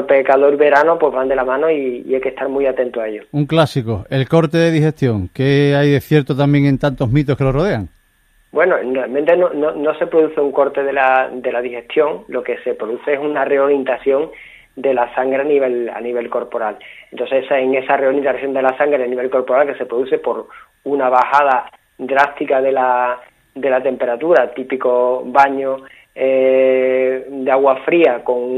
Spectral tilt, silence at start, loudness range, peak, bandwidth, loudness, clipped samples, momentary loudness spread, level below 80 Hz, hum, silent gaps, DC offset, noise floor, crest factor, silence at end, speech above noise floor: -8 dB/octave; 0 s; 3 LU; 0 dBFS; 14.5 kHz; -16 LUFS; under 0.1%; 9 LU; -46 dBFS; none; none; under 0.1%; -56 dBFS; 16 dB; 0 s; 40 dB